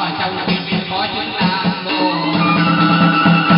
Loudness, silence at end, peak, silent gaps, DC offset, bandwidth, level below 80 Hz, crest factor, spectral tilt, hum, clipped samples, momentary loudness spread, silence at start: -15 LUFS; 0 s; -2 dBFS; none; under 0.1%; 5.6 kHz; -50 dBFS; 14 dB; -11 dB/octave; none; under 0.1%; 7 LU; 0 s